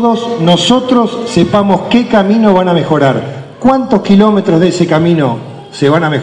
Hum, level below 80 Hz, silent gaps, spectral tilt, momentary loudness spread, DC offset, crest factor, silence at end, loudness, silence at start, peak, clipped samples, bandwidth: none; -44 dBFS; none; -6.5 dB/octave; 6 LU; under 0.1%; 10 dB; 0 s; -10 LUFS; 0 s; 0 dBFS; 2%; 10.5 kHz